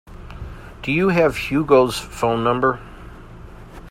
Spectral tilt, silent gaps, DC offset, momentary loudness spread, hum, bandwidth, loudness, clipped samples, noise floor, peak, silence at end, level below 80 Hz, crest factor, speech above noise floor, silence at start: -6 dB/octave; none; under 0.1%; 24 LU; none; 16 kHz; -19 LUFS; under 0.1%; -39 dBFS; 0 dBFS; 0 s; -40 dBFS; 20 dB; 21 dB; 0.1 s